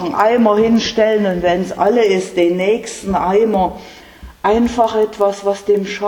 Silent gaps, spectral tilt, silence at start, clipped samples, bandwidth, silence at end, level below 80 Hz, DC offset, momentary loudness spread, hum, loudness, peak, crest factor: none; -5.5 dB/octave; 0 s; under 0.1%; 17.5 kHz; 0 s; -42 dBFS; under 0.1%; 7 LU; none; -15 LUFS; 0 dBFS; 14 dB